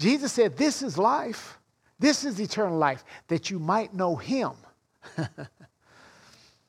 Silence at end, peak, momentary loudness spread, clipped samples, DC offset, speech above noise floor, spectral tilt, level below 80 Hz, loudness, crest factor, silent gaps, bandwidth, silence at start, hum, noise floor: 1.05 s; -8 dBFS; 15 LU; under 0.1%; under 0.1%; 31 dB; -4.5 dB/octave; -70 dBFS; -27 LUFS; 20 dB; none; 14.5 kHz; 0 s; none; -57 dBFS